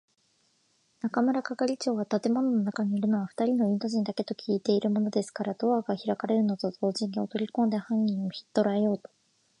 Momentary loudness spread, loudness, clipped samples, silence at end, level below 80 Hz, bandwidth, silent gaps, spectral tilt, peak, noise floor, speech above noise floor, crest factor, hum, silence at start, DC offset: 5 LU; -28 LUFS; under 0.1%; 0.6 s; -78 dBFS; 10.5 kHz; none; -6.5 dB/octave; -12 dBFS; -70 dBFS; 42 dB; 18 dB; none; 1.05 s; under 0.1%